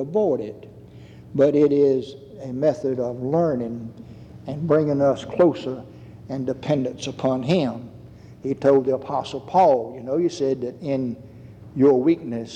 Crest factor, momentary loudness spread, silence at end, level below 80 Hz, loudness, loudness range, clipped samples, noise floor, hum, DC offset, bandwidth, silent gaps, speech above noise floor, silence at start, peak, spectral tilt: 16 dB; 19 LU; 0 s; -58 dBFS; -22 LUFS; 2 LU; under 0.1%; -43 dBFS; none; under 0.1%; 9 kHz; none; 22 dB; 0 s; -6 dBFS; -7.5 dB/octave